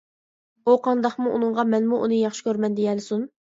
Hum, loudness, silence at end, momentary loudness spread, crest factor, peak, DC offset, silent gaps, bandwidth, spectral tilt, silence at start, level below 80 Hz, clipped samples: none; -23 LUFS; 0.3 s; 7 LU; 18 dB; -4 dBFS; under 0.1%; none; 7.8 kHz; -6 dB/octave; 0.65 s; -74 dBFS; under 0.1%